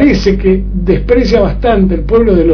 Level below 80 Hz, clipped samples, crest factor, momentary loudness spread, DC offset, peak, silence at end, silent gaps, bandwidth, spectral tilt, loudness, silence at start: -18 dBFS; 0.6%; 8 dB; 4 LU; under 0.1%; 0 dBFS; 0 s; none; 5.4 kHz; -8 dB/octave; -10 LUFS; 0 s